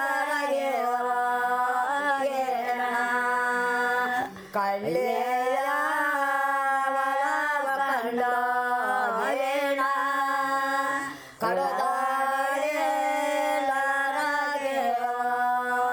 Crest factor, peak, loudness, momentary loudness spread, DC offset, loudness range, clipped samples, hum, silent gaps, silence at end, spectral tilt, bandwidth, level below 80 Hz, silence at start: 14 dB; -12 dBFS; -26 LUFS; 2 LU; under 0.1%; 1 LU; under 0.1%; none; none; 0 s; -3 dB/octave; over 20 kHz; -74 dBFS; 0 s